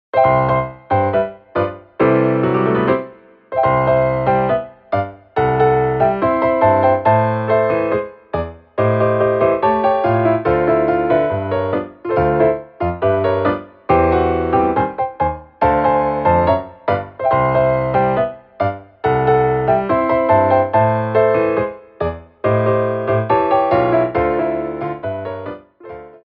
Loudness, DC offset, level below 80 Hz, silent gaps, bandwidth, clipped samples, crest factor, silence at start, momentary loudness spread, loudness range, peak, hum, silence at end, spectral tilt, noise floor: -16 LUFS; under 0.1%; -40 dBFS; none; 5.2 kHz; under 0.1%; 14 dB; 0.15 s; 10 LU; 2 LU; -2 dBFS; none; 0.1 s; -10.5 dB/octave; -38 dBFS